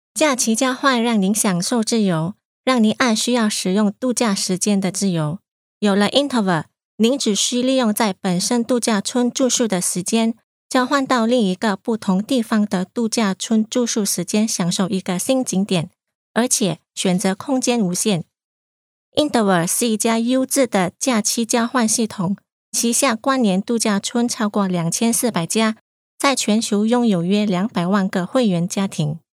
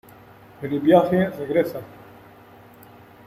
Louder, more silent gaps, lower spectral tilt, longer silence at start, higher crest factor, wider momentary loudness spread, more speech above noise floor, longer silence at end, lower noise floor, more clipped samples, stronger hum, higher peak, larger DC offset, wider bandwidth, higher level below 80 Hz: about the same, -19 LUFS vs -20 LUFS; first, 2.45-2.64 s, 5.48-5.81 s, 6.85-6.98 s, 10.43-10.69 s, 16.15-16.34 s, 18.44-19.12 s, 22.52-22.72 s, 25.81-26.18 s vs none; second, -4 dB/octave vs -8 dB/octave; second, 0.15 s vs 0.6 s; about the same, 16 dB vs 20 dB; second, 5 LU vs 19 LU; first, over 72 dB vs 27 dB; second, 0.2 s vs 1.4 s; first, under -90 dBFS vs -47 dBFS; neither; neither; about the same, -2 dBFS vs -4 dBFS; neither; about the same, 16 kHz vs 16 kHz; second, -70 dBFS vs -60 dBFS